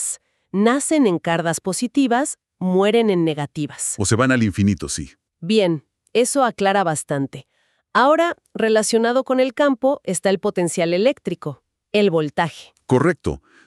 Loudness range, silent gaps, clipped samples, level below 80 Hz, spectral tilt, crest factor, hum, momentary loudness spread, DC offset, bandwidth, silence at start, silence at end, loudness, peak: 2 LU; none; under 0.1%; -50 dBFS; -4.5 dB/octave; 16 dB; none; 10 LU; under 0.1%; 13.5 kHz; 0 s; 0.3 s; -19 LUFS; -2 dBFS